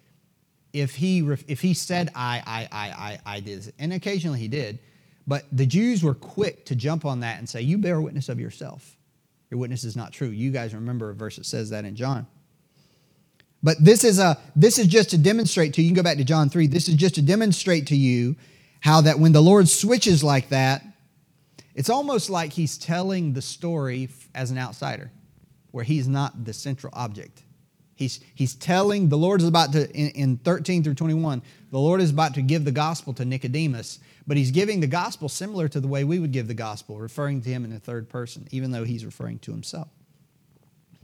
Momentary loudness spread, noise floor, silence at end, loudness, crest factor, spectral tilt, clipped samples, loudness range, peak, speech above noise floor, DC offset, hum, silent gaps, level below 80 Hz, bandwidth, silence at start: 17 LU; -66 dBFS; 1.2 s; -22 LUFS; 20 dB; -5.5 dB/octave; under 0.1%; 13 LU; -2 dBFS; 44 dB; under 0.1%; none; none; -66 dBFS; 17.5 kHz; 0.75 s